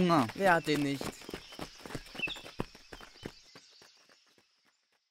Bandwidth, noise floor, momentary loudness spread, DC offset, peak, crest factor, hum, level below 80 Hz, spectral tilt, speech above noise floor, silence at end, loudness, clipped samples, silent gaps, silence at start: 16 kHz; -74 dBFS; 23 LU; under 0.1%; -12 dBFS; 22 dB; none; -60 dBFS; -5 dB/octave; 45 dB; 1.5 s; -33 LUFS; under 0.1%; none; 0 s